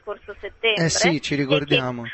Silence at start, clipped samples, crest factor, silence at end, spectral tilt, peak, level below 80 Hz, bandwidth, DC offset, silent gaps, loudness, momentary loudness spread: 0.05 s; under 0.1%; 18 dB; 0 s; -3.5 dB/octave; -4 dBFS; -52 dBFS; 8.6 kHz; under 0.1%; none; -20 LUFS; 16 LU